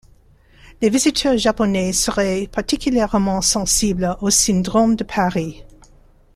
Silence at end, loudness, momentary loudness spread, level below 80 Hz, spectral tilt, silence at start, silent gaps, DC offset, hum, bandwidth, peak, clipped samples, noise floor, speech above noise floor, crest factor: 0.7 s; -17 LUFS; 6 LU; -38 dBFS; -3.5 dB/octave; 0.65 s; none; under 0.1%; none; 15.5 kHz; -2 dBFS; under 0.1%; -50 dBFS; 33 dB; 16 dB